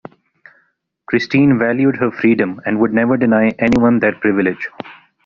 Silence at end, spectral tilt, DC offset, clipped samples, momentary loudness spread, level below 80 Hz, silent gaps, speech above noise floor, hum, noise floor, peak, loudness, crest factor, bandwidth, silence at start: 0.3 s; -6 dB/octave; under 0.1%; under 0.1%; 7 LU; -48 dBFS; none; 48 dB; none; -62 dBFS; -2 dBFS; -15 LUFS; 14 dB; 7 kHz; 1.1 s